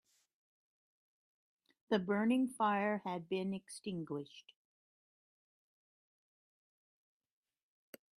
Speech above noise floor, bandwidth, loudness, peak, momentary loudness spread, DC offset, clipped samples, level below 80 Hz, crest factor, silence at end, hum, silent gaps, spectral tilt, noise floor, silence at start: over 53 dB; 14.5 kHz; -37 LUFS; -20 dBFS; 11 LU; under 0.1%; under 0.1%; -84 dBFS; 22 dB; 3.75 s; none; none; -6 dB/octave; under -90 dBFS; 1.9 s